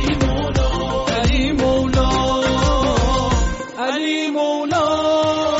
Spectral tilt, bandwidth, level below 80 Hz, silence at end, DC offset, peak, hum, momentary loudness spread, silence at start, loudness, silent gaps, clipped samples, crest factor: -4.5 dB/octave; 8 kHz; -24 dBFS; 0 s; under 0.1%; -6 dBFS; none; 4 LU; 0 s; -18 LUFS; none; under 0.1%; 12 dB